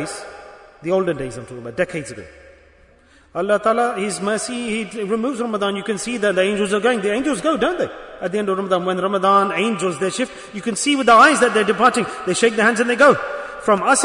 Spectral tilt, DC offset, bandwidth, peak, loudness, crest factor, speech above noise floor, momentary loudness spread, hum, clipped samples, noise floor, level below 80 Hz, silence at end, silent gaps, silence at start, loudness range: -3.5 dB/octave; under 0.1%; 11 kHz; 0 dBFS; -18 LUFS; 18 dB; 33 dB; 14 LU; none; under 0.1%; -51 dBFS; -54 dBFS; 0 s; none; 0 s; 8 LU